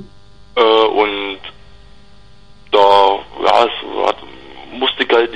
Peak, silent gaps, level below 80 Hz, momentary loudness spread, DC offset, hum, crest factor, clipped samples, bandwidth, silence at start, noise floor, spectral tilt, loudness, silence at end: 0 dBFS; none; -48 dBFS; 20 LU; 1%; 50 Hz at -50 dBFS; 16 dB; under 0.1%; 9.4 kHz; 0 s; -45 dBFS; -4 dB/octave; -14 LUFS; 0 s